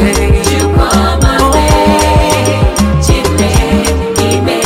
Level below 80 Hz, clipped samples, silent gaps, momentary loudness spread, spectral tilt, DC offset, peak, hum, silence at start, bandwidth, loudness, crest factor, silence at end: -14 dBFS; 0.1%; none; 3 LU; -5 dB/octave; under 0.1%; 0 dBFS; none; 0 s; 16.5 kHz; -10 LUFS; 8 dB; 0 s